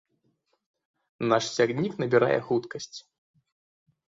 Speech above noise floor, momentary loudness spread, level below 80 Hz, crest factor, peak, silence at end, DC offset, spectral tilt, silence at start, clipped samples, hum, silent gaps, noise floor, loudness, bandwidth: 47 dB; 15 LU; -70 dBFS; 22 dB; -8 dBFS; 1.15 s; under 0.1%; -5 dB/octave; 1.2 s; under 0.1%; none; none; -73 dBFS; -26 LUFS; 7.8 kHz